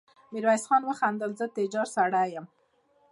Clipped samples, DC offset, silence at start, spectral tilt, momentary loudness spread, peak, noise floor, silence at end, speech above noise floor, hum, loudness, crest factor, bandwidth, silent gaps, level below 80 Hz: under 0.1%; under 0.1%; 0.3 s; -4.5 dB/octave; 8 LU; -12 dBFS; -67 dBFS; 0.65 s; 40 dB; none; -27 LUFS; 18 dB; 11.5 kHz; none; -86 dBFS